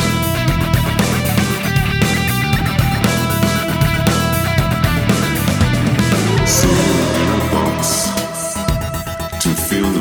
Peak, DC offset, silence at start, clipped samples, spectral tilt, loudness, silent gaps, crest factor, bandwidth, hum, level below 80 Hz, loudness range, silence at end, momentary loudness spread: 0 dBFS; under 0.1%; 0 s; under 0.1%; -4.5 dB/octave; -15 LUFS; none; 14 dB; over 20 kHz; none; -28 dBFS; 1 LU; 0 s; 5 LU